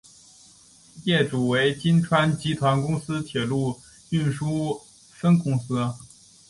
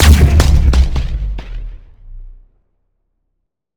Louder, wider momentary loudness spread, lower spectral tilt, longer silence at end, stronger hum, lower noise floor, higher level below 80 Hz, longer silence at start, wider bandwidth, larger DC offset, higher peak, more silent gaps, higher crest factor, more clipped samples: second, -24 LUFS vs -13 LUFS; second, 10 LU vs 22 LU; about the same, -6.5 dB/octave vs -5.5 dB/octave; second, 0.45 s vs 1.45 s; neither; second, -53 dBFS vs -71 dBFS; second, -56 dBFS vs -14 dBFS; first, 0.95 s vs 0 s; second, 11.5 kHz vs 19 kHz; neither; second, -6 dBFS vs 0 dBFS; neither; about the same, 18 dB vs 14 dB; second, under 0.1% vs 0.7%